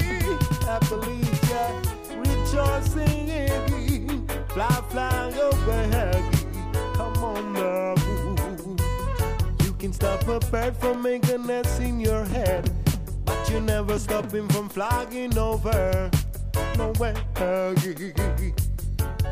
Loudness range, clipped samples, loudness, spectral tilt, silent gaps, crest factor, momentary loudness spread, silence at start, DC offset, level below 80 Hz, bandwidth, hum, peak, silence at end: 1 LU; under 0.1%; -25 LUFS; -6 dB/octave; none; 18 dB; 5 LU; 0 s; under 0.1%; -30 dBFS; 15.5 kHz; none; -6 dBFS; 0 s